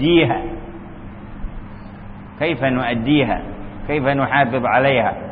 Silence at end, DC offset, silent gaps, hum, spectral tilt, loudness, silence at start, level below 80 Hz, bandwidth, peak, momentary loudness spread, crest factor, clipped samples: 0 s; under 0.1%; none; none; -11.5 dB/octave; -18 LUFS; 0 s; -36 dBFS; 4.8 kHz; -2 dBFS; 21 LU; 16 dB; under 0.1%